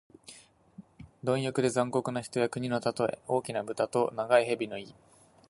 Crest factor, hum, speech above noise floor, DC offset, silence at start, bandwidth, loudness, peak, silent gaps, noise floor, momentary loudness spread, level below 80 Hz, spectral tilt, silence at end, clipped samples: 22 dB; none; 25 dB; under 0.1%; 0.3 s; 11.5 kHz; -30 LUFS; -10 dBFS; none; -54 dBFS; 16 LU; -68 dBFS; -5.5 dB/octave; 0.6 s; under 0.1%